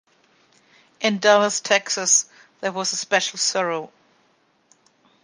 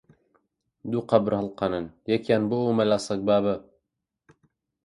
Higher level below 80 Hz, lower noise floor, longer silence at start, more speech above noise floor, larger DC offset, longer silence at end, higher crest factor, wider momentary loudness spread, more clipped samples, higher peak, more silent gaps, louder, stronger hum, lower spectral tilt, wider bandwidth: second, -78 dBFS vs -60 dBFS; second, -63 dBFS vs -82 dBFS; first, 1 s vs 0.85 s; second, 42 dB vs 58 dB; neither; about the same, 1.35 s vs 1.25 s; about the same, 22 dB vs 22 dB; first, 13 LU vs 8 LU; neither; first, -2 dBFS vs -6 dBFS; neither; first, -20 LUFS vs -25 LUFS; neither; second, -1 dB/octave vs -6.5 dB/octave; about the same, 10.5 kHz vs 11.5 kHz